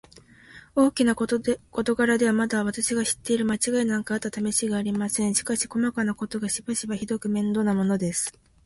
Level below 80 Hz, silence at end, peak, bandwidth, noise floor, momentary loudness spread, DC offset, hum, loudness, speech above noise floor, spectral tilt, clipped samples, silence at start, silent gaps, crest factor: -58 dBFS; 0.35 s; -8 dBFS; 12 kHz; -51 dBFS; 7 LU; under 0.1%; none; -25 LUFS; 27 dB; -4 dB/octave; under 0.1%; 0.5 s; none; 18 dB